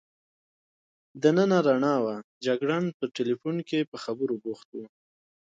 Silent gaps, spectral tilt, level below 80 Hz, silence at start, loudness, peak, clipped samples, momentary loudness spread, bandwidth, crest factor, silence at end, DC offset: 2.24-2.41 s, 2.94-3.00 s, 3.87-3.92 s, 4.65-4.72 s; -6.5 dB/octave; -76 dBFS; 1.15 s; -27 LUFS; -8 dBFS; under 0.1%; 13 LU; 7.8 kHz; 20 dB; 0.7 s; under 0.1%